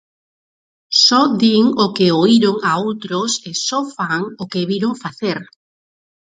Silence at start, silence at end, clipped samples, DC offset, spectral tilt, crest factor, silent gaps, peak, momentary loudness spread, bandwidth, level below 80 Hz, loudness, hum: 0.9 s; 0.85 s; under 0.1%; under 0.1%; -4 dB/octave; 16 dB; none; 0 dBFS; 11 LU; 9.4 kHz; -62 dBFS; -16 LUFS; none